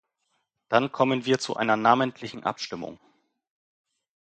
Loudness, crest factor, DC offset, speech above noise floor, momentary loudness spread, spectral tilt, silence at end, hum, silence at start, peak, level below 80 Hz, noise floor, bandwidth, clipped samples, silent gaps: -25 LUFS; 24 dB; under 0.1%; 51 dB; 13 LU; -5 dB/octave; 1.25 s; none; 0.7 s; -4 dBFS; -70 dBFS; -76 dBFS; 9.2 kHz; under 0.1%; none